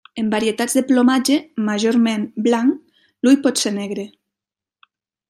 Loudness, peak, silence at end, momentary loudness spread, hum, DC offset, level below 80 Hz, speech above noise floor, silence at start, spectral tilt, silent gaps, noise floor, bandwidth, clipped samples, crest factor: -18 LUFS; -2 dBFS; 1.2 s; 10 LU; none; under 0.1%; -66 dBFS; 71 dB; 0.15 s; -4 dB/octave; none; -88 dBFS; 15 kHz; under 0.1%; 16 dB